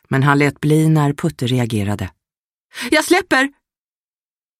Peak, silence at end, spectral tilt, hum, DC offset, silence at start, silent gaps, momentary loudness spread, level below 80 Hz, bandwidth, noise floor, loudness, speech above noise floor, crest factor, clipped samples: -2 dBFS; 1.1 s; -5.5 dB/octave; none; under 0.1%; 0.1 s; 2.38-2.69 s; 12 LU; -50 dBFS; 15.5 kHz; under -90 dBFS; -16 LUFS; over 74 dB; 16 dB; under 0.1%